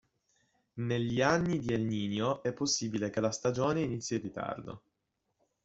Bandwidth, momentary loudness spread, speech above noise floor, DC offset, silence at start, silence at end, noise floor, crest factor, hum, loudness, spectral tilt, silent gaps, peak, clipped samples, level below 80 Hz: 8 kHz; 11 LU; 50 dB; under 0.1%; 0.75 s; 0.85 s; -82 dBFS; 22 dB; none; -32 LUFS; -5 dB/octave; none; -12 dBFS; under 0.1%; -64 dBFS